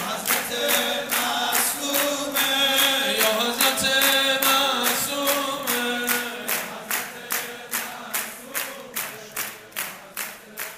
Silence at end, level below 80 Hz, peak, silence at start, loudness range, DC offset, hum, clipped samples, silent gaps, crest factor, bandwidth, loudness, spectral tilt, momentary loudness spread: 0 s; -62 dBFS; 0 dBFS; 0 s; 10 LU; under 0.1%; none; under 0.1%; none; 24 dB; 16 kHz; -22 LUFS; -0.5 dB/octave; 12 LU